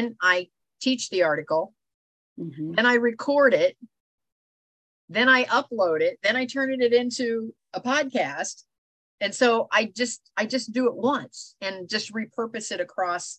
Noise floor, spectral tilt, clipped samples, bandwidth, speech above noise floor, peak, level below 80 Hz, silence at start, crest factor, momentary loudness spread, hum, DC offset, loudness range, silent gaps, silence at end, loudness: under -90 dBFS; -3 dB/octave; under 0.1%; 9.4 kHz; over 66 dB; -6 dBFS; -76 dBFS; 0 s; 18 dB; 13 LU; none; under 0.1%; 3 LU; 1.94-2.36 s, 4.00-4.18 s, 4.32-5.08 s, 8.78-9.18 s; 0.05 s; -24 LUFS